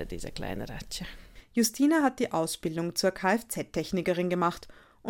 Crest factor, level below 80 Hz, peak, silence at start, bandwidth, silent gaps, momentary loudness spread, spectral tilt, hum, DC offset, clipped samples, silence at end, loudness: 18 dB; -50 dBFS; -12 dBFS; 0 s; 17 kHz; none; 14 LU; -4.5 dB/octave; none; under 0.1%; under 0.1%; 0 s; -29 LUFS